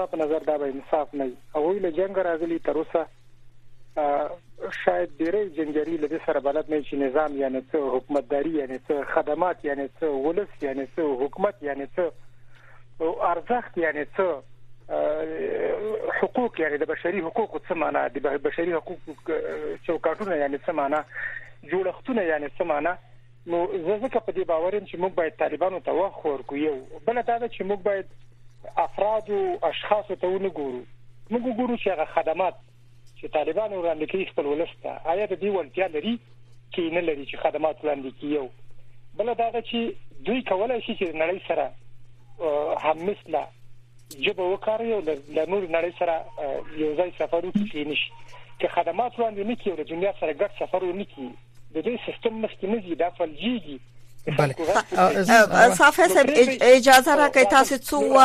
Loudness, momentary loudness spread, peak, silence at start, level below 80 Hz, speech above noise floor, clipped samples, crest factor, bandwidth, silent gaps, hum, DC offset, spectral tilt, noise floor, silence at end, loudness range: -25 LUFS; 11 LU; -2 dBFS; 0 s; -56 dBFS; 23 dB; under 0.1%; 22 dB; 15 kHz; none; none; under 0.1%; -4 dB/octave; -47 dBFS; 0 s; 6 LU